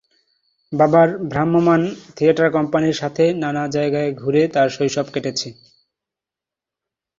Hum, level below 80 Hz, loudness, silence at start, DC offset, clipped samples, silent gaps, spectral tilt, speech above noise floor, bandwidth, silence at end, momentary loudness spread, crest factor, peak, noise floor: none; -58 dBFS; -18 LUFS; 0.7 s; under 0.1%; under 0.1%; none; -6 dB/octave; 70 dB; 7.6 kHz; 1.7 s; 8 LU; 18 dB; -2 dBFS; -88 dBFS